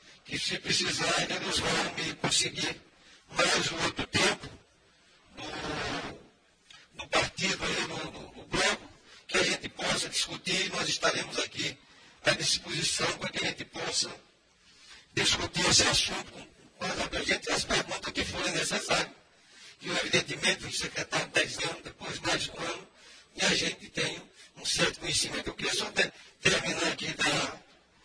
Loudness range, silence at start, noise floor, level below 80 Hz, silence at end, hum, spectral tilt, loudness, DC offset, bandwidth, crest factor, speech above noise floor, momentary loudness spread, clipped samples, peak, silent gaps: 4 LU; 0.05 s; -63 dBFS; -56 dBFS; 0.45 s; none; -2 dB/octave; -29 LUFS; under 0.1%; 10.5 kHz; 22 dB; 32 dB; 12 LU; under 0.1%; -10 dBFS; none